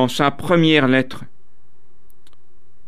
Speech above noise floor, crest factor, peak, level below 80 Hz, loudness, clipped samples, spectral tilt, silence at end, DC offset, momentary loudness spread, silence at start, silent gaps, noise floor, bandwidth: 43 dB; 18 dB; -2 dBFS; -54 dBFS; -16 LUFS; under 0.1%; -6 dB/octave; 1.65 s; 4%; 15 LU; 0 s; none; -60 dBFS; 14.5 kHz